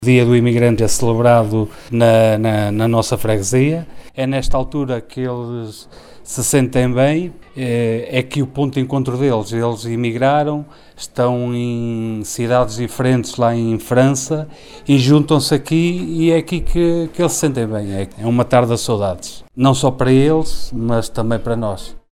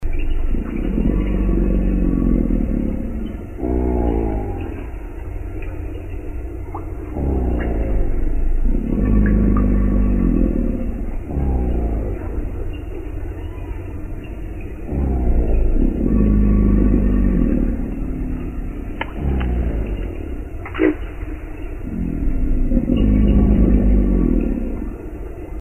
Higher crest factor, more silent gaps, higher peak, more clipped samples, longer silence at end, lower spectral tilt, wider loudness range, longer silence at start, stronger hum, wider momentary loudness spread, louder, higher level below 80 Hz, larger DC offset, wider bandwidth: about the same, 16 dB vs 16 dB; neither; about the same, 0 dBFS vs -2 dBFS; neither; first, 0.15 s vs 0 s; second, -6 dB/octave vs -10 dB/octave; second, 4 LU vs 8 LU; about the same, 0 s vs 0 s; neither; second, 11 LU vs 14 LU; first, -16 LUFS vs -21 LUFS; second, -34 dBFS vs -20 dBFS; second, under 0.1% vs 0.7%; first, 16 kHz vs 3.2 kHz